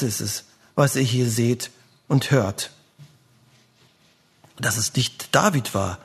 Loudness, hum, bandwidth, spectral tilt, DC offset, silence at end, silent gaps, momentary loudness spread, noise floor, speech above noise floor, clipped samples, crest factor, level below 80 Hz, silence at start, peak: -22 LUFS; none; 13.5 kHz; -4.5 dB/octave; under 0.1%; 0.1 s; none; 10 LU; -59 dBFS; 38 dB; under 0.1%; 24 dB; -60 dBFS; 0 s; 0 dBFS